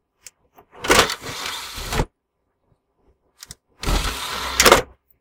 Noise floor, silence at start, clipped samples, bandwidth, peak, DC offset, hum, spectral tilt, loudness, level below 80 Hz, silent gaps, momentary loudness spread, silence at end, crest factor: -73 dBFS; 0.75 s; under 0.1%; 19 kHz; 0 dBFS; under 0.1%; none; -2 dB/octave; -19 LUFS; -34 dBFS; none; 24 LU; 0.35 s; 22 dB